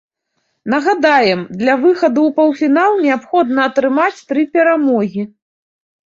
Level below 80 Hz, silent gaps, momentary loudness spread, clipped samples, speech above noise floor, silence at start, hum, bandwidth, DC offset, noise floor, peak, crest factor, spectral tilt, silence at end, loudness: -62 dBFS; none; 7 LU; under 0.1%; 55 dB; 0.65 s; none; 7.6 kHz; under 0.1%; -69 dBFS; -2 dBFS; 14 dB; -6 dB/octave; 0.9 s; -14 LUFS